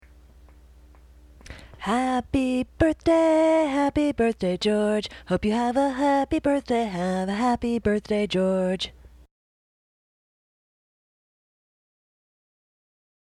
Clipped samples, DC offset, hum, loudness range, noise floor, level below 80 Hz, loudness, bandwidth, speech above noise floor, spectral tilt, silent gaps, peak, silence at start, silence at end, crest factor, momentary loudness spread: under 0.1%; under 0.1%; none; 7 LU; -51 dBFS; -48 dBFS; -24 LUFS; 12 kHz; 28 dB; -6 dB/octave; none; -10 dBFS; 1.5 s; 4.4 s; 16 dB; 7 LU